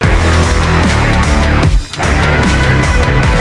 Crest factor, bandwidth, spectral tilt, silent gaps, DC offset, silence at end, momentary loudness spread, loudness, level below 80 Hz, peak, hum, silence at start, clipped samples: 10 dB; 11.5 kHz; -5.5 dB/octave; none; under 0.1%; 0 s; 2 LU; -11 LUFS; -14 dBFS; 0 dBFS; none; 0 s; under 0.1%